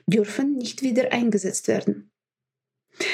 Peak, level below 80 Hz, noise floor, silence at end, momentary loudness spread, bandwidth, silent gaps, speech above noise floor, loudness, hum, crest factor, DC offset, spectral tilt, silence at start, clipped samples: -6 dBFS; -78 dBFS; -89 dBFS; 0 s; 7 LU; 15 kHz; none; 66 dB; -24 LUFS; none; 20 dB; under 0.1%; -4.5 dB/octave; 0.05 s; under 0.1%